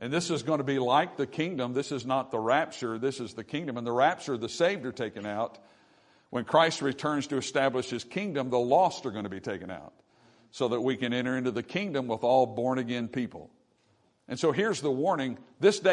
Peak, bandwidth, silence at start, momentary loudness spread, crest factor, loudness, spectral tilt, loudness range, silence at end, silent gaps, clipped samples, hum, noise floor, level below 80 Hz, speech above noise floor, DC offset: -8 dBFS; 11 kHz; 0 s; 11 LU; 22 dB; -29 LUFS; -5 dB/octave; 3 LU; 0 s; none; under 0.1%; none; -68 dBFS; -72 dBFS; 40 dB; under 0.1%